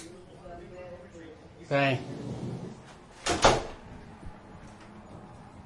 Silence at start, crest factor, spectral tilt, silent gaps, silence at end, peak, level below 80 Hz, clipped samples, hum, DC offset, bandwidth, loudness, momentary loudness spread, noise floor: 0 s; 28 dB; -4 dB/octave; none; 0 s; -4 dBFS; -48 dBFS; under 0.1%; none; under 0.1%; 11.5 kHz; -28 LUFS; 25 LU; -50 dBFS